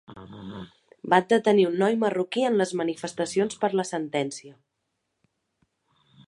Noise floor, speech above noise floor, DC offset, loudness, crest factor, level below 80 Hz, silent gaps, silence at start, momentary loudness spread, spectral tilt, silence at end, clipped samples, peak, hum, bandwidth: -79 dBFS; 54 dB; under 0.1%; -24 LUFS; 22 dB; -68 dBFS; none; 0.1 s; 20 LU; -5 dB/octave; 1.75 s; under 0.1%; -6 dBFS; none; 11.5 kHz